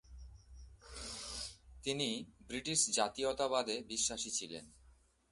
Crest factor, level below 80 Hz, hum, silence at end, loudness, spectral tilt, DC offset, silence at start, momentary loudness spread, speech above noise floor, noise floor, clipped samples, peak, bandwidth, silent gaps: 22 dB; -60 dBFS; none; 0.4 s; -37 LUFS; -2 dB/octave; under 0.1%; 0.1 s; 19 LU; 29 dB; -67 dBFS; under 0.1%; -18 dBFS; 11.5 kHz; none